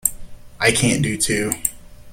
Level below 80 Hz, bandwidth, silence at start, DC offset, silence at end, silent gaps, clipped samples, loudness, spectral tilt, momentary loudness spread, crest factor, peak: -40 dBFS; 17 kHz; 0.05 s; under 0.1%; 0 s; none; under 0.1%; -19 LUFS; -3 dB/octave; 7 LU; 22 dB; 0 dBFS